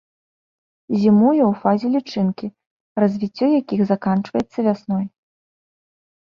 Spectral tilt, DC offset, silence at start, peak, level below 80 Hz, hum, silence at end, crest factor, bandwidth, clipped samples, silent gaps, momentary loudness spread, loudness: -9 dB/octave; under 0.1%; 0.9 s; -4 dBFS; -60 dBFS; none; 1.3 s; 18 dB; 6.6 kHz; under 0.1%; 2.66-2.96 s; 10 LU; -19 LUFS